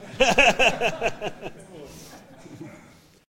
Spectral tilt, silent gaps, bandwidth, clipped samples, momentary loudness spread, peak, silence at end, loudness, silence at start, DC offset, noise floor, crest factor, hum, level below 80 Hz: -2.5 dB/octave; none; 16.5 kHz; under 0.1%; 26 LU; -2 dBFS; 0.55 s; -20 LUFS; 0 s; under 0.1%; -52 dBFS; 22 dB; none; -44 dBFS